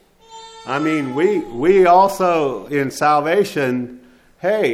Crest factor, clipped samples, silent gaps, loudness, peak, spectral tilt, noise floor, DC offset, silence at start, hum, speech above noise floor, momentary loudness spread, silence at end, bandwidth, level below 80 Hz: 16 dB; under 0.1%; none; -17 LUFS; -2 dBFS; -5.5 dB/octave; -41 dBFS; under 0.1%; 0.3 s; none; 25 dB; 13 LU; 0 s; 15.5 kHz; -50 dBFS